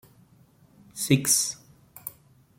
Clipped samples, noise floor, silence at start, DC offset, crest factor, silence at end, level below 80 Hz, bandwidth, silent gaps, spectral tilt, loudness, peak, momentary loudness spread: under 0.1%; -58 dBFS; 0.95 s; under 0.1%; 24 dB; 0.5 s; -66 dBFS; 16.5 kHz; none; -3 dB/octave; -23 LUFS; -6 dBFS; 22 LU